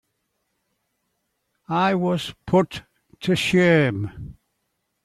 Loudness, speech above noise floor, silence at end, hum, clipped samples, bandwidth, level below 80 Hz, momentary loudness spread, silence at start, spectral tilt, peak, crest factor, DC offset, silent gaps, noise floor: -21 LUFS; 54 dB; 0.7 s; none; under 0.1%; 13 kHz; -54 dBFS; 17 LU; 1.7 s; -6 dB/octave; -6 dBFS; 18 dB; under 0.1%; none; -75 dBFS